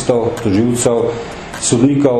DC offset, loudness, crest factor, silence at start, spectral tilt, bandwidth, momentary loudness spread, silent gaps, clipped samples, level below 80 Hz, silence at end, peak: under 0.1%; -14 LUFS; 14 dB; 0 s; -5.5 dB/octave; 12.5 kHz; 9 LU; none; under 0.1%; -42 dBFS; 0 s; 0 dBFS